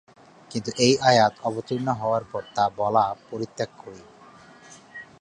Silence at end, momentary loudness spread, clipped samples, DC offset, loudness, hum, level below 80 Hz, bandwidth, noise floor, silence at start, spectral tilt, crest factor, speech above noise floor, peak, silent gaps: 0.15 s; 23 LU; under 0.1%; under 0.1%; -24 LUFS; none; -62 dBFS; 10.5 kHz; -49 dBFS; 0.5 s; -4.5 dB/octave; 22 dB; 26 dB; -4 dBFS; none